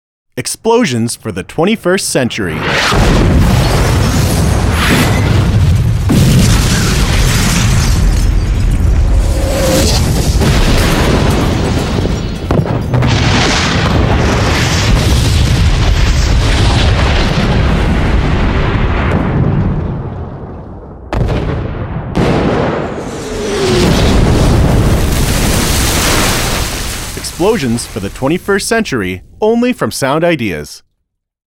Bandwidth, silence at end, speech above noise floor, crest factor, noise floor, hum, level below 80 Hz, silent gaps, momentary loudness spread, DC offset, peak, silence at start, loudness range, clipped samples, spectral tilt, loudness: 16.5 kHz; 0.7 s; 56 dB; 10 dB; -68 dBFS; none; -16 dBFS; none; 9 LU; under 0.1%; 0 dBFS; 0.35 s; 5 LU; under 0.1%; -5 dB/octave; -12 LUFS